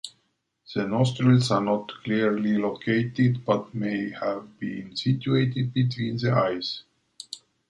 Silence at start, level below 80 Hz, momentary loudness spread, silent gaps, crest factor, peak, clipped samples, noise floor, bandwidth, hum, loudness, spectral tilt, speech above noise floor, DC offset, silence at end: 0.05 s; -62 dBFS; 13 LU; none; 18 dB; -6 dBFS; under 0.1%; -73 dBFS; 11.5 kHz; none; -25 LUFS; -7 dB/octave; 48 dB; under 0.1%; 0.3 s